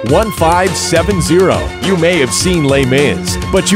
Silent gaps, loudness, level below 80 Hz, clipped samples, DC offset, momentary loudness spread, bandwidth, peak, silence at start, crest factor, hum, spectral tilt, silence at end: none; -12 LUFS; -28 dBFS; under 0.1%; under 0.1%; 4 LU; 16.5 kHz; 0 dBFS; 0 s; 12 dB; none; -4.5 dB/octave; 0 s